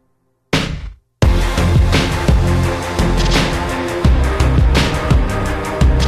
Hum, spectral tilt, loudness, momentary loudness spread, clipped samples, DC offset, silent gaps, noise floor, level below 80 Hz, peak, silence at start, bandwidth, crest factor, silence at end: none; -5.5 dB/octave; -16 LUFS; 6 LU; under 0.1%; under 0.1%; none; -62 dBFS; -18 dBFS; -2 dBFS; 0.5 s; 14.5 kHz; 12 dB; 0 s